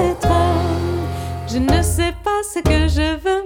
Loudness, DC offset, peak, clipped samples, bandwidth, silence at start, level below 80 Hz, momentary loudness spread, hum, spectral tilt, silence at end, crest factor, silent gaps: -18 LUFS; under 0.1%; -2 dBFS; under 0.1%; 17 kHz; 0 s; -26 dBFS; 7 LU; none; -5.5 dB/octave; 0 s; 14 dB; none